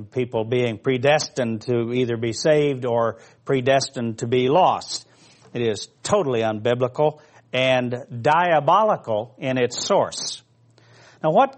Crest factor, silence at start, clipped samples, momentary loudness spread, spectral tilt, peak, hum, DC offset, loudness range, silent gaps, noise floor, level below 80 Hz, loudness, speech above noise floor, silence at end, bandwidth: 18 dB; 0 s; under 0.1%; 10 LU; -5 dB/octave; -4 dBFS; none; under 0.1%; 2 LU; none; -55 dBFS; -64 dBFS; -21 LUFS; 34 dB; 0 s; 8.8 kHz